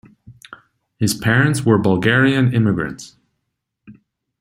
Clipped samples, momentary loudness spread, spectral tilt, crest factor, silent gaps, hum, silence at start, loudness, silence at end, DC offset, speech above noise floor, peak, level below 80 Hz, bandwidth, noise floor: under 0.1%; 9 LU; -6 dB/octave; 18 dB; none; none; 0.3 s; -16 LUFS; 0.5 s; under 0.1%; 60 dB; -2 dBFS; -52 dBFS; 16 kHz; -76 dBFS